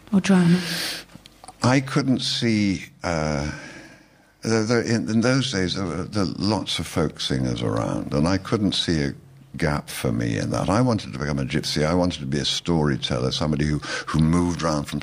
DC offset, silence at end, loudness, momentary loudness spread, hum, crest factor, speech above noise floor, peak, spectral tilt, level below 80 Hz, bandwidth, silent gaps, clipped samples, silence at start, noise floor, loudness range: under 0.1%; 0 s; -23 LUFS; 7 LU; none; 16 dB; 31 dB; -6 dBFS; -5.5 dB/octave; -42 dBFS; 15.5 kHz; none; under 0.1%; 0.1 s; -53 dBFS; 2 LU